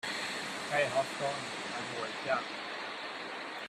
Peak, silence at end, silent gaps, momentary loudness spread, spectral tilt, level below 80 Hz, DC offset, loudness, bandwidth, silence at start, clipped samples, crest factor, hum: -16 dBFS; 0 s; none; 8 LU; -2.5 dB/octave; -78 dBFS; under 0.1%; -35 LUFS; 14 kHz; 0.05 s; under 0.1%; 20 dB; none